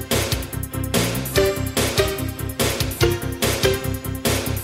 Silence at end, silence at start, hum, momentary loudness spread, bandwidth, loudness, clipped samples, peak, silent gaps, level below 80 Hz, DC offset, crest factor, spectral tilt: 0 s; 0 s; none; 7 LU; 16.5 kHz; -21 LUFS; under 0.1%; -2 dBFS; none; -34 dBFS; under 0.1%; 20 dB; -4 dB/octave